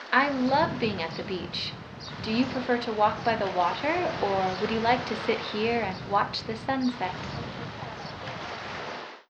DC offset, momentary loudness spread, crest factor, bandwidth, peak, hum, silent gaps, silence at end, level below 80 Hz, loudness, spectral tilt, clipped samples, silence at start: under 0.1%; 12 LU; 22 dB; 8.6 kHz; -6 dBFS; none; none; 0.1 s; -56 dBFS; -28 LUFS; -5.5 dB/octave; under 0.1%; 0 s